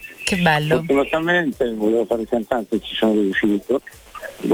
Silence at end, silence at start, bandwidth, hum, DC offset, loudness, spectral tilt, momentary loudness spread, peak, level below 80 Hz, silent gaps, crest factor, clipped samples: 0 s; 0 s; 19.5 kHz; none; under 0.1%; -20 LUFS; -5.5 dB/octave; 7 LU; -2 dBFS; -48 dBFS; none; 18 dB; under 0.1%